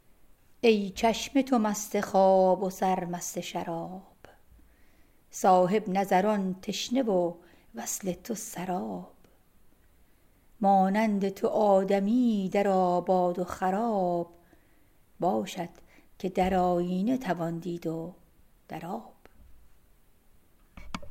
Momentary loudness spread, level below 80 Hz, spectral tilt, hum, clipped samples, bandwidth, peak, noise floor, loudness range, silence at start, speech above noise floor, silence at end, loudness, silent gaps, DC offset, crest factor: 15 LU; -58 dBFS; -5.5 dB/octave; none; under 0.1%; 16 kHz; -10 dBFS; -61 dBFS; 9 LU; 0.65 s; 34 dB; 0 s; -28 LUFS; none; under 0.1%; 20 dB